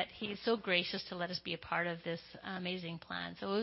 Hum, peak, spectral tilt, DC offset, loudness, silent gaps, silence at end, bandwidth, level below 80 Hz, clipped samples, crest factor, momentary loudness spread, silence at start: none; -16 dBFS; -2.5 dB/octave; under 0.1%; -38 LUFS; none; 0 s; 5.8 kHz; -70 dBFS; under 0.1%; 22 dB; 10 LU; 0 s